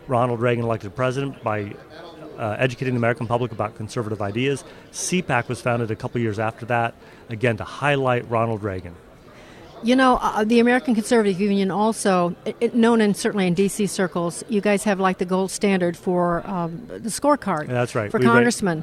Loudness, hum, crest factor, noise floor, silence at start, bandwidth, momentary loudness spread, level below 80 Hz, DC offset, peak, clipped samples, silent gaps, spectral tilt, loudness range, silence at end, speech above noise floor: -22 LUFS; none; 18 dB; -45 dBFS; 0 s; 14.5 kHz; 11 LU; -52 dBFS; under 0.1%; -2 dBFS; under 0.1%; none; -5.5 dB/octave; 6 LU; 0 s; 24 dB